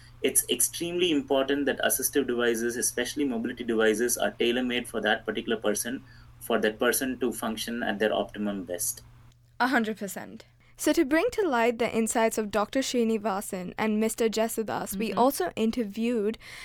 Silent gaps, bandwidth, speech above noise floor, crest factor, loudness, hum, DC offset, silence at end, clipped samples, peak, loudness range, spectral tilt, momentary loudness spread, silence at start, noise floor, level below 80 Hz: none; 19.5 kHz; 28 dB; 20 dB; -27 LUFS; none; under 0.1%; 0 s; under 0.1%; -8 dBFS; 3 LU; -3 dB/octave; 7 LU; 0.1 s; -55 dBFS; -56 dBFS